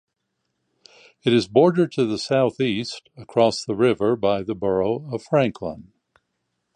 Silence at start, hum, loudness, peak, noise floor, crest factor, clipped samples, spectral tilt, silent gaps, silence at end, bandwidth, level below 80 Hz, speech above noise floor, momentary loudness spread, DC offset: 1.25 s; none; -21 LUFS; -2 dBFS; -76 dBFS; 20 dB; under 0.1%; -6 dB/octave; none; 0.95 s; 10 kHz; -56 dBFS; 56 dB; 11 LU; under 0.1%